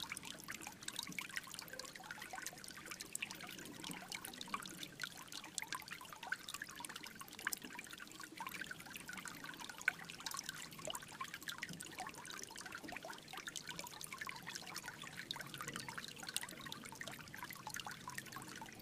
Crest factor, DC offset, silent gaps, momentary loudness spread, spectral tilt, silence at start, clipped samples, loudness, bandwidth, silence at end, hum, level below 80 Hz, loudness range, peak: 34 dB; under 0.1%; none; 6 LU; -1.5 dB/octave; 0 s; under 0.1%; -47 LUFS; 15.5 kHz; 0 s; none; -76 dBFS; 2 LU; -16 dBFS